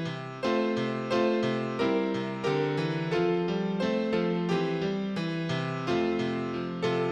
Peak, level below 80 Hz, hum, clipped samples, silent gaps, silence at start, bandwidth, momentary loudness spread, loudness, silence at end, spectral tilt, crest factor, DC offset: -16 dBFS; -66 dBFS; none; under 0.1%; none; 0 s; 9 kHz; 4 LU; -29 LUFS; 0 s; -7 dB/octave; 14 dB; under 0.1%